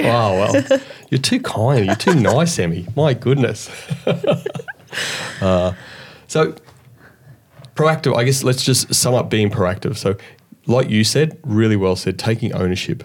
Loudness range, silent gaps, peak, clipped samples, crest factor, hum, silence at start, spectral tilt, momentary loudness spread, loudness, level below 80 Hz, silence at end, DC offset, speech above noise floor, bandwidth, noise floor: 4 LU; none; -2 dBFS; under 0.1%; 16 dB; none; 0 s; -5 dB/octave; 9 LU; -17 LUFS; -52 dBFS; 0 s; under 0.1%; 29 dB; 18 kHz; -46 dBFS